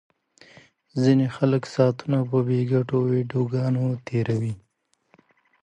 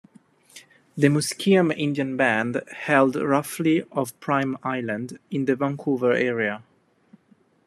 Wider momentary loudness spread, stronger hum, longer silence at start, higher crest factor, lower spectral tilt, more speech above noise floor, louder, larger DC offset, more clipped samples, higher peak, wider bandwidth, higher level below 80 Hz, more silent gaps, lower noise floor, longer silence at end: second, 6 LU vs 9 LU; neither; first, 0.95 s vs 0.55 s; about the same, 18 dB vs 20 dB; first, -8.5 dB/octave vs -5.5 dB/octave; first, 48 dB vs 38 dB; about the same, -23 LUFS vs -23 LUFS; neither; neither; about the same, -6 dBFS vs -4 dBFS; second, 8.8 kHz vs 14 kHz; first, -62 dBFS vs -70 dBFS; neither; first, -71 dBFS vs -60 dBFS; about the same, 1.05 s vs 1.1 s